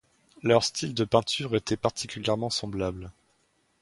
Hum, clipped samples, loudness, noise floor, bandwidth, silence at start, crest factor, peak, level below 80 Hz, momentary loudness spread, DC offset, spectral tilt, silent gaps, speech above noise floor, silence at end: none; under 0.1%; -27 LUFS; -69 dBFS; 11.5 kHz; 0.45 s; 22 dB; -6 dBFS; -54 dBFS; 9 LU; under 0.1%; -4.5 dB/octave; none; 42 dB; 0.7 s